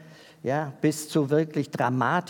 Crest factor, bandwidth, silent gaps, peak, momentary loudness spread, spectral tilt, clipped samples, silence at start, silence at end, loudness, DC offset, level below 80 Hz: 16 dB; 18 kHz; none; -10 dBFS; 6 LU; -6 dB/octave; under 0.1%; 0 s; 0 s; -26 LUFS; under 0.1%; -78 dBFS